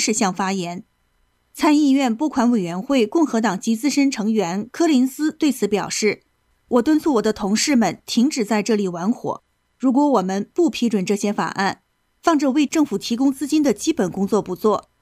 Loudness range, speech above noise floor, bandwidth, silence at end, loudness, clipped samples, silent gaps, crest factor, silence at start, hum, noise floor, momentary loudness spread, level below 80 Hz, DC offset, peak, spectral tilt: 1 LU; 45 dB; 15.5 kHz; 0.2 s; -20 LUFS; under 0.1%; none; 14 dB; 0 s; none; -64 dBFS; 6 LU; -58 dBFS; under 0.1%; -4 dBFS; -4.5 dB/octave